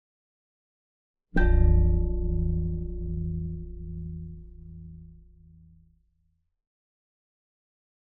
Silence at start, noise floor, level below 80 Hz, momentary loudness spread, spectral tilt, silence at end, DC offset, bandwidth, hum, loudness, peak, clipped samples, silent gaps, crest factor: 1.35 s; -72 dBFS; -30 dBFS; 23 LU; -9 dB/octave; 2.95 s; under 0.1%; 3.9 kHz; none; -29 LUFS; -10 dBFS; under 0.1%; none; 18 dB